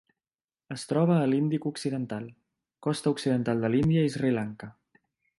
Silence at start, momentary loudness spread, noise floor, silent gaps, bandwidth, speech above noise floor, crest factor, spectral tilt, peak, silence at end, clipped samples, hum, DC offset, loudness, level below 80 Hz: 0.7 s; 15 LU; under -90 dBFS; none; 11.5 kHz; over 63 dB; 16 dB; -7 dB/octave; -12 dBFS; 0.7 s; under 0.1%; none; under 0.1%; -27 LUFS; -62 dBFS